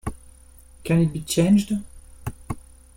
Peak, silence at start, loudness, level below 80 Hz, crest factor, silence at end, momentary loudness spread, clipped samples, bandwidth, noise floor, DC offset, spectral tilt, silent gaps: -8 dBFS; 0.05 s; -22 LUFS; -44 dBFS; 16 dB; 0.4 s; 18 LU; under 0.1%; 16.5 kHz; -48 dBFS; under 0.1%; -6 dB/octave; none